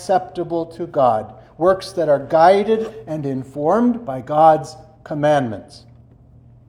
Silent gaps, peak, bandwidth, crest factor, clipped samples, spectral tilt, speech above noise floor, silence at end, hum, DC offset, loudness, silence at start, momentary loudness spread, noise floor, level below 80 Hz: none; 0 dBFS; 12 kHz; 18 dB; under 0.1%; -6.5 dB/octave; 29 dB; 0.9 s; none; under 0.1%; -18 LUFS; 0 s; 14 LU; -47 dBFS; -54 dBFS